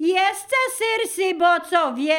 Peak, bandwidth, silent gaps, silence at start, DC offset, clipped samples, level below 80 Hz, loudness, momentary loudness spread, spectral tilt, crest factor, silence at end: -4 dBFS; 18 kHz; none; 0 s; under 0.1%; under 0.1%; -70 dBFS; -20 LUFS; 4 LU; -0.5 dB/octave; 16 dB; 0 s